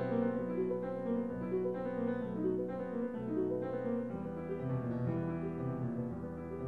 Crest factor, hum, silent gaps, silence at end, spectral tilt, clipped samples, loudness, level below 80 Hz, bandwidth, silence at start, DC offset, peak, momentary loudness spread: 16 dB; none; none; 0 s; -10.5 dB/octave; under 0.1%; -37 LUFS; -62 dBFS; 4.6 kHz; 0 s; under 0.1%; -22 dBFS; 4 LU